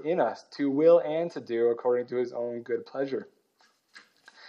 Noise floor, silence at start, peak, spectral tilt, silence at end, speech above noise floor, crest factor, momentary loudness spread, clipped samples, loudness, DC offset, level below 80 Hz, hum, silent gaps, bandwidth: -67 dBFS; 0 s; -10 dBFS; -7 dB/octave; 0 s; 40 dB; 18 dB; 12 LU; under 0.1%; -27 LUFS; under 0.1%; under -90 dBFS; none; none; 6.8 kHz